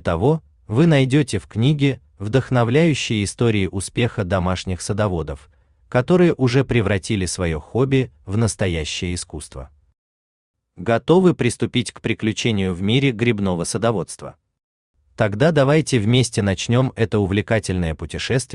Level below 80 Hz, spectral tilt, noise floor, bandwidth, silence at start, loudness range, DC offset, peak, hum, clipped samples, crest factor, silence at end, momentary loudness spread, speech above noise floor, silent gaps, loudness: -44 dBFS; -6 dB/octave; under -90 dBFS; 11 kHz; 0.05 s; 3 LU; under 0.1%; -2 dBFS; none; under 0.1%; 16 dB; 0 s; 9 LU; over 71 dB; 9.98-10.54 s, 14.64-14.94 s; -19 LUFS